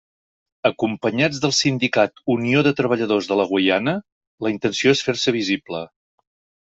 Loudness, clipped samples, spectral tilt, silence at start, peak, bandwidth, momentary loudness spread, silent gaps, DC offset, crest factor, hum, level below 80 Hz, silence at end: -20 LUFS; under 0.1%; -4.5 dB/octave; 0.65 s; -2 dBFS; 8 kHz; 8 LU; 4.12-4.21 s, 4.27-4.38 s; under 0.1%; 18 dB; none; -60 dBFS; 0.85 s